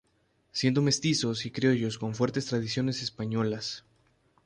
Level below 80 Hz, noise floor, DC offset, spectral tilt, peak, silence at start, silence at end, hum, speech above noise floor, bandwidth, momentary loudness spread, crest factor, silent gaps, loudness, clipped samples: -64 dBFS; -70 dBFS; under 0.1%; -5 dB/octave; -12 dBFS; 0.55 s; 0.65 s; none; 42 dB; 11 kHz; 8 LU; 16 dB; none; -29 LUFS; under 0.1%